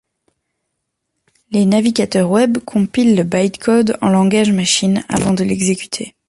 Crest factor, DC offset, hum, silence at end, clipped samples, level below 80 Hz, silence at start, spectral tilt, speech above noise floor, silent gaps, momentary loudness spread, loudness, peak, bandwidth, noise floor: 14 dB; under 0.1%; none; 0.2 s; under 0.1%; -48 dBFS; 1.5 s; -5 dB/octave; 60 dB; none; 4 LU; -15 LUFS; -2 dBFS; 11.5 kHz; -74 dBFS